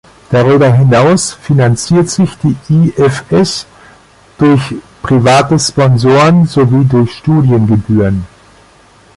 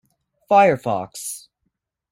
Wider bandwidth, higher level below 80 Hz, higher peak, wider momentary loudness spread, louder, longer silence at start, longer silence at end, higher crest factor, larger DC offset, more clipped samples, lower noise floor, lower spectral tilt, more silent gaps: second, 11.5 kHz vs 16 kHz; first, -38 dBFS vs -62 dBFS; about the same, 0 dBFS vs -2 dBFS; second, 7 LU vs 16 LU; first, -9 LUFS vs -18 LUFS; second, 0.3 s vs 0.5 s; first, 0.9 s vs 0.75 s; second, 10 dB vs 18 dB; neither; neither; second, -43 dBFS vs -75 dBFS; first, -6.5 dB/octave vs -4.5 dB/octave; neither